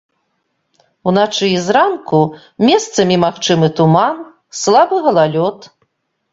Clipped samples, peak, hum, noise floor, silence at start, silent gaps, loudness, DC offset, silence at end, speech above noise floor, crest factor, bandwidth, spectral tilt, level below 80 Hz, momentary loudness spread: under 0.1%; 0 dBFS; none; -67 dBFS; 1.05 s; none; -13 LUFS; under 0.1%; 0.65 s; 54 dB; 14 dB; 7.8 kHz; -5 dB/octave; -56 dBFS; 8 LU